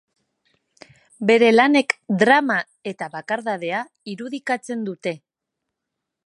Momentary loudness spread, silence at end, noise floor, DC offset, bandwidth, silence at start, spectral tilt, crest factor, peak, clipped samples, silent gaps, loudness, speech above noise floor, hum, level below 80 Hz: 17 LU; 1.1 s; -82 dBFS; under 0.1%; 11.5 kHz; 1.2 s; -5 dB/octave; 22 dB; 0 dBFS; under 0.1%; none; -20 LUFS; 62 dB; none; -74 dBFS